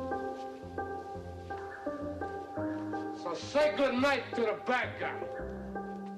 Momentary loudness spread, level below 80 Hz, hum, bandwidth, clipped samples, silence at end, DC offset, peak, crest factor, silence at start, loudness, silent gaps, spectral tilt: 13 LU; -58 dBFS; none; 13 kHz; under 0.1%; 0 s; under 0.1%; -22 dBFS; 14 dB; 0 s; -35 LUFS; none; -5.5 dB/octave